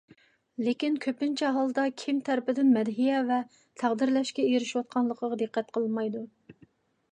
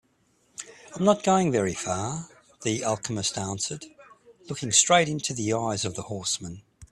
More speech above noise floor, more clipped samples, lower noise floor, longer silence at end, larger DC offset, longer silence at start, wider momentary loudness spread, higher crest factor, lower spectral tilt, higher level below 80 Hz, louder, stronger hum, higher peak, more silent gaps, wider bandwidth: second, 34 dB vs 41 dB; neither; second, -62 dBFS vs -67 dBFS; first, 0.6 s vs 0.05 s; neither; about the same, 0.6 s vs 0.6 s; second, 7 LU vs 21 LU; second, 16 dB vs 24 dB; first, -5 dB/octave vs -3.5 dB/octave; second, -80 dBFS vs -60 dBFS; second, -28 LUFS vs -25 LUFS; neither; second, -12 dBFS vs -4 dBFS; neither; second, 9.6 kHz vs 14.5 kHz